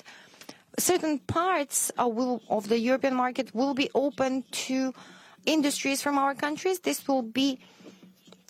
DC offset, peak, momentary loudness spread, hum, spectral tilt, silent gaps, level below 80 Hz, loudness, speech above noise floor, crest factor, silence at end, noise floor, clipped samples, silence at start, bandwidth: under 0.1%; -12 dBFS; 6 LU; none; -3 dB/octave; none; -70 dBFS; -27 LUFS; 27 dB; 16 dB; 0.6 s; -55 dBFS; under 0.1%; 0.05 s; 16.5 kHz